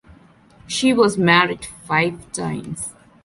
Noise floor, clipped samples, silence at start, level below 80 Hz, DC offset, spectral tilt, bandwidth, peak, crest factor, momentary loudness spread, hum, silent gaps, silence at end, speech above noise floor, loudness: -49 dBFS; under 0.1%; 0.7 s; -52 dBFS; under 0.1%; -4.5 dB/octave; 11.5 kHz; -2 dBFS; 20 dB; 15 LU; none; none; 0.35 s; 30 dB; -19 LUFS